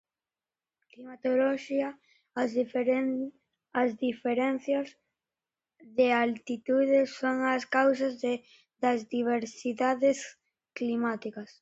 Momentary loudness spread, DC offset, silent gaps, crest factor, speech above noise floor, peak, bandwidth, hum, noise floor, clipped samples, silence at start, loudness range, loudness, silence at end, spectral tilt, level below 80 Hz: 11 LU; under 0.1%; none; 20 dB; over 61 dB; -10 dBFS; 8 kHz; none; under -90 dBFS; under 0.1%; 1 s; 3 LU; -29 LUFS; 0.15 s; -4.5 dB/octave; -78 dBFS